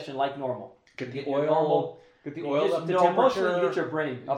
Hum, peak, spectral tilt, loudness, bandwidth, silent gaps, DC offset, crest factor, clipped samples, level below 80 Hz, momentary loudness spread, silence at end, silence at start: none; -8 dBFS; -6.5 dB/octave; -26 LUFS; 10.5 kHz; none; under 0.1%; 18 dB; under 0.1%; -72 dBFS; 15 LU; 0 s; 0 s